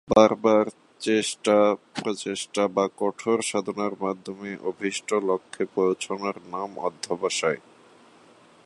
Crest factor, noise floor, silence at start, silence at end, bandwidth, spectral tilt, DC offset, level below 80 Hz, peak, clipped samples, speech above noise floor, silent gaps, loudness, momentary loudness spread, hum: 24 dB; -54 dBFS; 0.1 s; 1.05 s; 11.5 kHz; -4 dB/octave; under 0.1%; -62 dBFS; -2 dBFS; under 0.1%; 29 dB; none; -25 LUFS; 11 LU; none